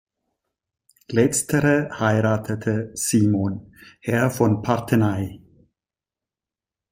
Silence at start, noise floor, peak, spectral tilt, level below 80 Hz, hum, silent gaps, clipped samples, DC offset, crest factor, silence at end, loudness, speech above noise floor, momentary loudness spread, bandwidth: 1.1 s; under -90 dBFS; -4 dBFS; -6 dB/octave; -56 dBFS; none; none; under 0.1%; under 0.1%; 20 dB; 1.55 s; -21 LUFS; over 69 dB; 8 LU; 16.5 kHz